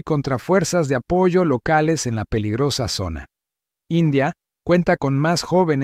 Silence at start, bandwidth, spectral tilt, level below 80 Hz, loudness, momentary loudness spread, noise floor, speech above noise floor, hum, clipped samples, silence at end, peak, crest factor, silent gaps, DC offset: 0.05 s; 15.5 kHz; -5.5 dB/octave; -44 dBFS; -19 LUFS; 7 LU; -86 dBFS; 67 dB; none; under 0.1%; 0 s; -4 dBFS; 14 dB; none; under 0.1%